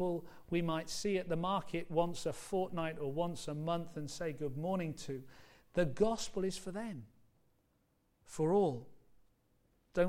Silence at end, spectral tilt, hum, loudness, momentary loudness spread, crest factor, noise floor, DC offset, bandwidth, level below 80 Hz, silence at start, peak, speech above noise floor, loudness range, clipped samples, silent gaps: 0 s; -5.5 dB/octave; none; -38 LUFS; 11 LU; 18 dB; -76 dBFS; under 0.1%; 16.5 kHz; -60 dBFS; 0 s; -18 dBFS; 39 dB; 3 LU; under 0.1%; none